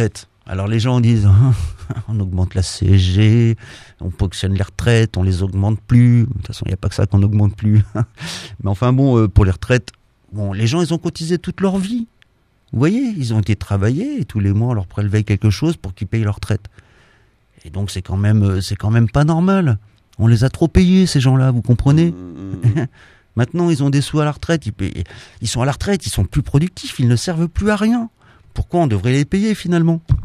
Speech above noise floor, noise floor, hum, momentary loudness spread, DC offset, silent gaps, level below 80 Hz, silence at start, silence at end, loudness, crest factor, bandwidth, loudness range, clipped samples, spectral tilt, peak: 40 dB; -56 dBFS; none; 12 LU; under 0.1%; none; -32 dBFS; 0 s; 0 s; -17 LUFS; 16 dB; 13 kHz; 5 LU; under 0.1%; -7 dB/octave; 0 dBFS